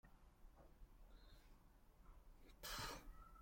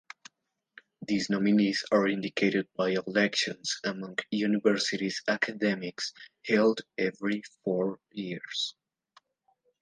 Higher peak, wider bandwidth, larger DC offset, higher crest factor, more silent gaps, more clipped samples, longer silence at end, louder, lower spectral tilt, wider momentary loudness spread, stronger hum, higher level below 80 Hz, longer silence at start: second, -38 dBFS vs -12 dBFS; first, 16.5 kHz vs 9.8 kHz; neither; about the same, 22 dB vs 18 dB; neither; neither; second, 0 s vs 1.1 s; second, -53 LUFS vs -29 LUFS; second, -2.5 dB/octave vs -4.5 dB/octave; first, 19 LU vs 11 LU; neither; first, -64 dBFS vs -76 dBFS; second, 0.05 s vs 1 s